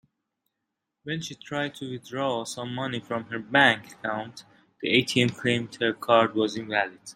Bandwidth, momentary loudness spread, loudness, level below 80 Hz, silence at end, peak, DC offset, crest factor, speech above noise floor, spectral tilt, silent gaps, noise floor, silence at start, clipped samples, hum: 16 kHz; 13 LU; -26 LUFS; -68 dBFS; 0.05 s; -4 dBFS; under 0.1%; 24 dB; 57 dB; -4.5 dB/octave; none; -83 dBFS; 1.05 s; under 0.1%; none